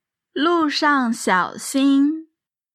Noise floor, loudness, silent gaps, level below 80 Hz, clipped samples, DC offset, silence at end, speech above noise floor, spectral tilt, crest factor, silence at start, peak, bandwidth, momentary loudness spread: -64 dBFS; -19 LUFS; none; -74 dBFS; under 0.1%; under 0.1%; 0.5 s; 45 dB; -3.5 dB/octave; 14 dB; 0.35 s; -6 dBFS; 14.5 kHz; 6 LU